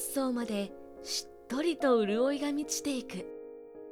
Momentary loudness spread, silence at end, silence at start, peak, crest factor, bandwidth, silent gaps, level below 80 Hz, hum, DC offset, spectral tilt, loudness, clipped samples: 18 LU; 0 s; 0 s; -14 dBFS; 18 dB; 18 kHz; none; -68 dBFS; none; under 0.1%; -3.5 dB/octave; -32 LUFS; under 0.1%